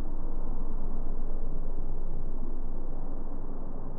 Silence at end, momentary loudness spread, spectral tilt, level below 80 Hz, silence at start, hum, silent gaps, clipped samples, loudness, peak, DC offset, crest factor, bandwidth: 0 s; 3 LU; -11 dB/octave; -28 dBFS; 0 s; none; none; under 0.1%; -39 LUFS; -18 dBFS; under 0.1%; 6 dB; 1.5 kHz